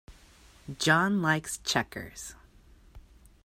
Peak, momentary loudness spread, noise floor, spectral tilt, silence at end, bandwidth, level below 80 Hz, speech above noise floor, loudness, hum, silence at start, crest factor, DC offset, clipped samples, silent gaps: -10 dBFS; 20 LU; -57 dBFS; -4 dB/octave; 0.45 s; 16 kHz; -56 dBFS; 28 dB; -27 LUFS; none; 0.1 s; 22 dB; under 0.1%; under 0.1%; none